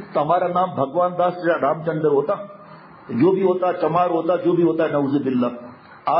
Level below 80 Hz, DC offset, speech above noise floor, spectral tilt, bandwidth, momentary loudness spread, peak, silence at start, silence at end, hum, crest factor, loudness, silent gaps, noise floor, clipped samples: -66 dBFS; under 0.1%; 24 dB; -12 dB/octave; 5.6 kHz; 7 LU; -6 dBFS; 0 s; 0 s; none; 14 dB; -20 LUFS; none; -43 dBFS; under 0.1%